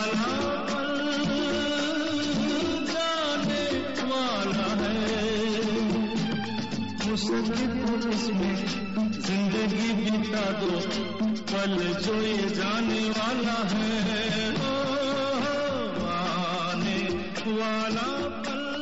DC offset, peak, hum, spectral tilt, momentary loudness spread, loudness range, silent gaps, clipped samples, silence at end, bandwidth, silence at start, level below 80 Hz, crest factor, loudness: 0.6%; -20 dBFS; none; -3.5 dB/octave; 3 LU; 1 LU; none; under 0.1%; 0 s; 8 kHz; 0 s; -54 dBFS; 8 dB; -27 LUFS